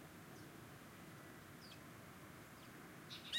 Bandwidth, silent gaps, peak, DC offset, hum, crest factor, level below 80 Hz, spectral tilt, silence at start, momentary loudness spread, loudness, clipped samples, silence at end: 16.5 kHz; none; -30 dBFS; under 0.1%; none; 24 dB; -78 dBFS; -3.5 dB/octave; 0 s; 2 LU; -57 LUFS; under 0.1%; 0 s